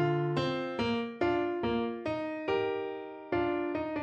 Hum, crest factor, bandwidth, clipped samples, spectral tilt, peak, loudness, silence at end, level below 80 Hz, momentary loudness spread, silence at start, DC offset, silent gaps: none; 16 dB; 8 kHz; under 0.1%; -7.5 dB/octave; -16 dBFS; -32 LUFS; 0 s; -58 dBFS; 5 LU; 0 s; under 0.1%; none